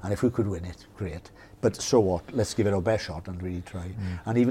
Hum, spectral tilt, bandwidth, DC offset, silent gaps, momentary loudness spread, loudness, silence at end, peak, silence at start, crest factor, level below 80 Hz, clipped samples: none; -6 dB/octave; 16 kHz; under 0.1%; none; 13 LU; -28 LUFS; 0 s; -8 dBFS; 0 s; 20 dB; -48 dBFS; under 0.1%